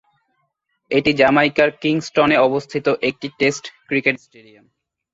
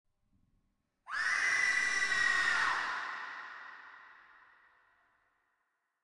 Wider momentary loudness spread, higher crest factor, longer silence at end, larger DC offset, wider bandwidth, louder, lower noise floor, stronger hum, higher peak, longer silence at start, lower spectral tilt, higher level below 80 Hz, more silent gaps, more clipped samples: second, 8 LU vs 19 LU; about the same, 18 dB vs 18 dB; second, 0.95 s vs 1.65 s; neither; second, 8 kHz vs 11.5 kHz; first, -17 LUFS vs -31 LUFS; second, -70 dBFS vs -82 dBFS; neither; first, -2 dBFS vs -20 dBFS; second, 0.9 s vs 1.05 s; first, -5 dB/octave vs 1 dB/octave; first, -56 dBFS vs -74 dBFS; neither; neither